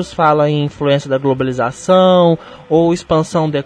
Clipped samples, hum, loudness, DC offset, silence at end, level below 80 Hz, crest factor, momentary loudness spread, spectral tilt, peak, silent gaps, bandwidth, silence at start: under 0.1%; none; -14 LUFS; under 0.1%; 0.05 s; -46 dBFS; 14 dB; 7 LU; -6.5 dB/octave; 0 dBFS; none; 10.5 kHz; 0 s